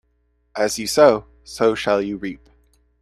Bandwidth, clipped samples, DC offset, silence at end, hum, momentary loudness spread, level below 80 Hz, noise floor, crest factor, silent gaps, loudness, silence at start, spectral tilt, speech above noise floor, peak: 14 kHz; under 0.1%; under 0.1%; 0.65 s; none; 20 LU; -52 dBFS; -65 dBFS; 20 dB; none; -19 LUFS; 0.55 s; -3.5 dB/octave; 46 dB; 0 dBFS